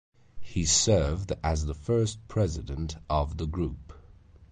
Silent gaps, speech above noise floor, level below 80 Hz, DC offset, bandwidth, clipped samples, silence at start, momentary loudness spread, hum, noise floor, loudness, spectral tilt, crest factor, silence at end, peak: none; 25 dB; -38 dBFS; under 0.1%; 9.8 kHz; under 0.1%; 0.35 s; 12 LU; none; -53 dBFS; -28 LUFS; -4.5 dB/octave; 18 dB; 0.05 s; -10 dBFS